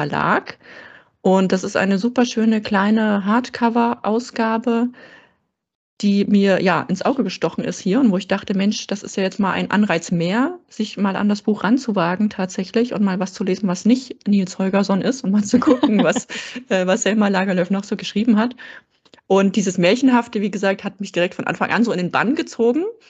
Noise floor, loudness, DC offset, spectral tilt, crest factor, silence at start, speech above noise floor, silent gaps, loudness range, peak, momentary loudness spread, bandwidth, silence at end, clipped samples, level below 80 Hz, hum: -65 dBFS; -19 LUFS; under 0.1%; -5.5 dB/octave; 16 dB; 0 s; 46 dB; 5.75-5.97 s; 2 LU; -2 dBFS; 7 LU; 8.2 kHz; 0.2 s; under 0.1%; -62 dBFS; none